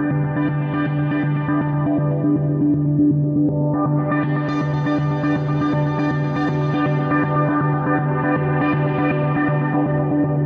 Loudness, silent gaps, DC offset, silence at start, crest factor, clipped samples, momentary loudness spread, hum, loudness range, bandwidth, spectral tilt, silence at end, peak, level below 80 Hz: -19 LUFS; none; under 0.1%; 0 s; 12 dB; under 0.1%; 2 LU; none; 1 LU; 5 kHz; -10 dB/octave; 0 s; -6 dBFS; -48 dBFS